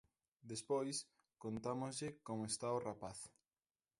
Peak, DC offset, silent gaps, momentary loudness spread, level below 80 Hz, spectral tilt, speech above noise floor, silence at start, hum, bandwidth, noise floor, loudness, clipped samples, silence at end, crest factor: -28 dBFS; under 0.1%; none; 13 LU; -76 dBFS; -4.5 dB/octave; over 46 dB; 0.45 s; none; 11.5 kHz; under -90 dBFS; -45 LUFS; under 0.1%; 0.7 s; 18 dB